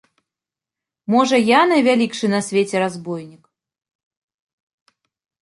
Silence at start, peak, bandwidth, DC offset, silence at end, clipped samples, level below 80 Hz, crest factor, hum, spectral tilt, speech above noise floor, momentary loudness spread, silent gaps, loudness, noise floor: 1.1 s; -2 dBFS; 11.5 kHz; under 0.1%; 2.1 s; under 0.1%; -68 dBFS; 18 dB; none; -4.5 dB/octave; 71 dB; 16 LU; none; -17 LUFS; -88 dBFS